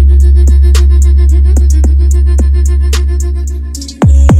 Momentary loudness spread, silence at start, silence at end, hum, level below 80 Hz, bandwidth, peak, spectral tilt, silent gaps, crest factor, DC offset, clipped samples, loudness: 9 LU; 0 s; 0 s; none; -6 dBFS; 10 kHz; 0 dBFS; -6.5 dB/octave; none; 6 dB; under 0.1%; under 0.1%; -9 LUFS